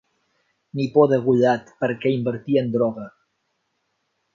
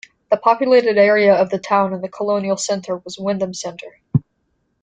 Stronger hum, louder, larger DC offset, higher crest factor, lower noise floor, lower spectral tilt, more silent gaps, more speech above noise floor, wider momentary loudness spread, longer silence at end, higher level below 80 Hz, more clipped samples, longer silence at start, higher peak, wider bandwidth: neither; second, -21 LUFS vs -17 LUFS; neither; about the same, 20 dB vs 16 dB; first, -73 dBFS vs -68 dBFS; first, -8 dB/octave vs -5 dB/octave; neither; about the same, 53 dB vs 51 dB; about the same, 13 LU vs 12 LU; first, 1.25 s vs 0.6 s; about the same, -64 dBFS vs -60 dBFS; neither; first, 0.75 s vs 0.3 s; about the same, -2 dBFS vs -2 dBFS; second, 7.2 kHz vs 9.4 kHz